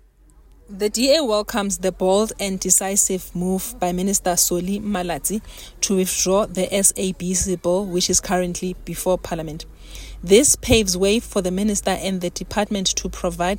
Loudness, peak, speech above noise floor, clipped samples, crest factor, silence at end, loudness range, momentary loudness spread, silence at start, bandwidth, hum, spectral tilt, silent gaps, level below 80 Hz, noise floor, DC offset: -20 LUFS; -2 dBFS; 30 dB; under 0.1%; 20 dB; 0 s; 2 LU; 10 LU; 0.7 s; 16.5 kHz; none; -3.5 dB/octave; none; -38 dBFS; -50 dBFS; under 0.1%